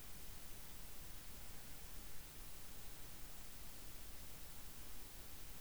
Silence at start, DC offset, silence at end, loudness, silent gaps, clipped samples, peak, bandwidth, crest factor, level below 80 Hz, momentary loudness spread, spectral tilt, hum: 0 s; 0.3%; 0 s; -53 LUFS; none; under 0.1%; -38 dBFS; over 20 kHz; 14 dB; -60 dBFS; 0 LU; -2.5 dB/octave; none